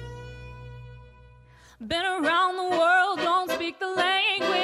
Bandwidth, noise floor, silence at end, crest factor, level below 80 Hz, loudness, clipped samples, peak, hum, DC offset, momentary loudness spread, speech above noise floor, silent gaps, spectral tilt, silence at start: 15.5 kHz; -53 dBFS; 0 s; 16 dB; -52 dBFS; -24 LUFS; under 0.1%; -10 dBFS; none; under 0.1%; 22 LU; 27 dB; none; -3.5 dB/octave; 0 s